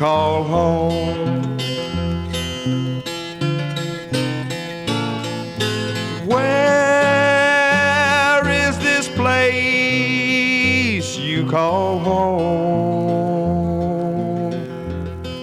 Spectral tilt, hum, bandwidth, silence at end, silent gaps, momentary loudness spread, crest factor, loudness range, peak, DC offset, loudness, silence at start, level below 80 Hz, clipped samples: -5 dB/octave; none; 14 kHz; 0 s; none; 10 LU; 14 dB; 8 LU; -4 dBFS; under 0.1%; -18 LUFS; 0 s; -42 dBFS; under 0.1%